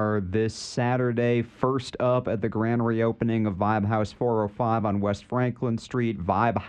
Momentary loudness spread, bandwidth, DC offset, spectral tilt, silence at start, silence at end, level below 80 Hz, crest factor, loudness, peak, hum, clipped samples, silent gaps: 4 LU; 9.6 kHz; under 0.1%; -7.5 dB/octave; 0 s; 0 s; -54 dBFS; 16 dB; -26 LUFS; -8 dBFS; none; under 0.1%; none